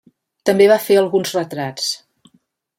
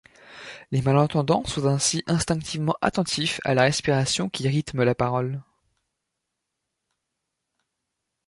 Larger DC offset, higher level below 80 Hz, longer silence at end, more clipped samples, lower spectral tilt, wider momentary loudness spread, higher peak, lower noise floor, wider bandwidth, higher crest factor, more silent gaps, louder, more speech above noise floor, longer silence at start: neither; second, -66 dBFS vs -52 dBFS; second, 0.8 s vs 2.85 s; neither; about the same, -4 dB/octave vs -4.5 dB/octave; first, 11 LU vs 8 LU; about the same, -2 dBFS vs -4 dBFS; second, -61 dBFS vs -81 dBFS; first, 16.5 kHz vs 11.5 kHz; second, 16 dB vs 22 dB; neither; first, -16 LUFS vs -23 LUFS; second, 45 dB vs 58 dB; first, 0.45 s vs 0.3 s